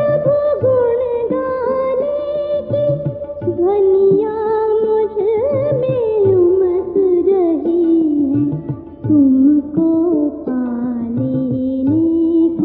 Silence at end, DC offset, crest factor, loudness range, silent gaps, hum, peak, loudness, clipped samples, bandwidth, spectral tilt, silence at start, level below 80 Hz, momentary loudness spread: 0 s; under 0.1%; 12 dB; 2 LU; none; none; -4 dBFS; -15 LUFS; under 0.1%; 4.3 kHz; -13.5 dB/octave; 0 s; -48 dBFS; 8 LU